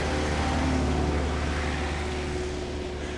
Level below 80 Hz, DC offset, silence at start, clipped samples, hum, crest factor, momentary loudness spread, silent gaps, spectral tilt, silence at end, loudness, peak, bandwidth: -34 dBFS; under 0.1%; 0 s; under 0.1%; none; 14 dB; 6 LU; none; -5.5 dB/octave; 0 s; -28 LUFS; -12 dBFS; 11.5 kHz